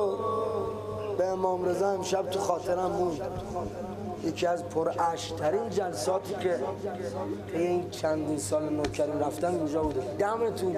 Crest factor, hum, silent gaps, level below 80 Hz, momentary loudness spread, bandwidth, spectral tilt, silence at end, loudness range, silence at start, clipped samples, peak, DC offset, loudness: 18 dB; none; none; -54 dBFS; 7 LU; 15 kHz; -5.5 dB/octave; 0 s; 1 LU; 0 s; under 0.1%; -12 dBFS; under 0.1%; -30 LUFS